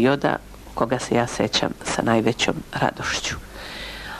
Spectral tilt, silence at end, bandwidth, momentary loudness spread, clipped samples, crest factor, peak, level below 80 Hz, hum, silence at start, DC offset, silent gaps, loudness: -4 dB/octave; 0 s; 13.5 kHz; 13 LU; under 0.1%; 18 dB; -6 dBFS; -44 dBFS; none; 0 s; under 0.1%; none; -23 LUFS